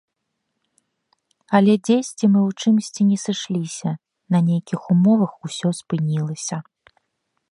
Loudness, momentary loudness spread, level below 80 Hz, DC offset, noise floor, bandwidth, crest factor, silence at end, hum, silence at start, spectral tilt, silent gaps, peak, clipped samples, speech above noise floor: -20 LUFS; 11 LU; -70 dBFS; under 0.1%; -77 dBFS; 11.5 kHz; 20 dB; 0.9 s; none; 1.5 s; -6.5 dB/octave; none; -2 dBFS; under 0.1%; 58 dB